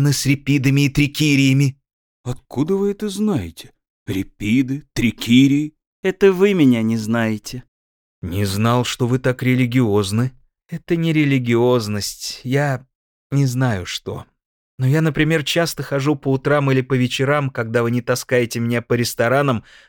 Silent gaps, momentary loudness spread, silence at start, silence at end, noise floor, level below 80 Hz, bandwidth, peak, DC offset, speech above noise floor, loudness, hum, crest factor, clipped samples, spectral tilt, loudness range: 1.93-2.24 s, 3.90-4.06 s, 5.87-6.03 s, 7.68-8.22 s, 12.95-13.30 s, 14.46-14.78 s; 12 LU; 0 s; 0.3 s; under -90 dBFS; -46 dBFS; 18.5 kHz; 0 dBFS; under 0.1%; over 72 dB; -18 LUFS; none; 18 dB; under 0.1%; -6 dB/octave; 4 LU